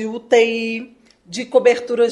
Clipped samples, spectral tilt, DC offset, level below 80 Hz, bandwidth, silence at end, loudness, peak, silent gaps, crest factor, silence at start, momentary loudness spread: under 0.1%; -3.5 dB/octave; under 0.1%; -66 dBFS; 10.5 kHz; 0 s; -17 LUFS; -2 dBFS; none; 16 dB; 0 s; 14 LU